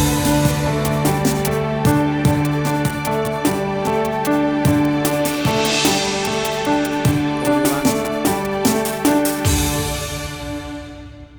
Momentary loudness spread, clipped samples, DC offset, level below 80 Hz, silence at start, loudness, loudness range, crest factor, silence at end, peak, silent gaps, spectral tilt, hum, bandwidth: 6 LU; under 0.1%; under 0.1%; -34 dBFS; 0 s; -18 LUFS; 1 LU; 16 dB; 0 s; -2 dBFS; none; -5 dB/octave; none; over 20 kHz